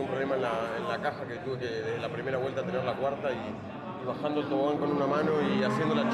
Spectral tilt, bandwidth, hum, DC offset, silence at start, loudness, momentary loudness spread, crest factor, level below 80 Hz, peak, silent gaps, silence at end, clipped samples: -7 dB/octave; 12.5 kHz; none; under 0.1%; 0 s; -31 LUFS; 9 LU; 14 dB; -66 dBFS; -16 dBFS; none; 0 s; under 0.1%